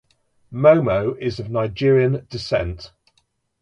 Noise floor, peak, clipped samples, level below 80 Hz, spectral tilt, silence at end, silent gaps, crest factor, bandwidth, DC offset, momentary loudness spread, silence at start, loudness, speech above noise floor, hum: -67 dBFS; 0 dBFS; under 0.1%; -44 dBFS; -7.5 dB/octave; 0.75 s; none; 20 dB; 9.4 kHz; under 0.1%; 14 LU; 0.5 s; -19 LUFS; 48 dB; none